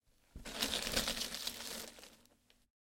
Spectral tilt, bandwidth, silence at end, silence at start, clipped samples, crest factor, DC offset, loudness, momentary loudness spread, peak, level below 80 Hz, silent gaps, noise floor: -1 dB/octave; 17 kHz; 0.85 s; 0.35 s; under 0.1%; 24 dB; under 0.1%; -38 LUFS; 18 LU; -18 dBFS; -58 dBFS; none; -70 dBFS